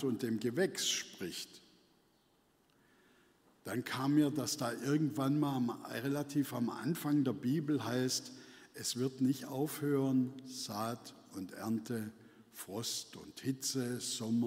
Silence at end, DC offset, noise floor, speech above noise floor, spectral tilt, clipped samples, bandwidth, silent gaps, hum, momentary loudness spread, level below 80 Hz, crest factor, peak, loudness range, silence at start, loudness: 0 s; under 0.1%; -72 dBFS; 36 dB; -4.5 dB/octave; under 0.1%; 16 kHz; none; none; 14 LU; -80 dBFS; 18 dB; -20 dBFS; 6 LU; 0 s; -36 LUFS